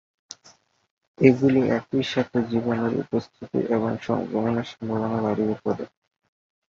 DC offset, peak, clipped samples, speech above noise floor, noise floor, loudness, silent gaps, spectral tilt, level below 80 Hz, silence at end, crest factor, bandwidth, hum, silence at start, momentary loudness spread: under 0.1%; -2 dBFS; under 0.1%; 33 dB; -57 dBFS; -24 LUFS; none; -7.5 dB/octave; -58 dBFS; 0.85 s; 22 dB; 7.4 kHz; none; 1.2 s; 12 LU